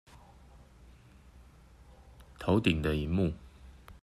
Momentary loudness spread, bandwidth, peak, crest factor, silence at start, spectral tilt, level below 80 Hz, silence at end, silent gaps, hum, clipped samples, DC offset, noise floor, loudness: 27 LU; 13.5 kHz; -14 dBFS; 22 dB; 0.55 s; -7 dB/octave; -48 dBFS; 0.1 s; none; none; under 0.1%; under 0.1%; -56 dBFS; -30 LUFS